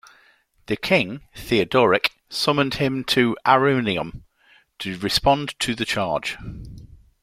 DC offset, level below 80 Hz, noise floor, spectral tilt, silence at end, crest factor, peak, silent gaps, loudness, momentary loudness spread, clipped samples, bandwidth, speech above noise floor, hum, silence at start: under 0.1%; -46 dBFS; -58 dBFS; -4.5 dB/octave; 0.3 s; 22 dB; 0 dBFS; none; -21 LUFS; 16 LU; under 0.1%; 16 kHz; 37 dB; none; 0.7 s